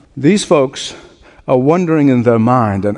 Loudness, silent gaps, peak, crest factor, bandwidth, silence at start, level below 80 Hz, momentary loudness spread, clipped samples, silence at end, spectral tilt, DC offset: -12 LUFS; none; 0 dBFS; 12 dB; 11 kHz; 0.15 s; -50 dBFS; 12 LU; under 0.1%; 0 s; -6.5 dB/octave; under 0.1%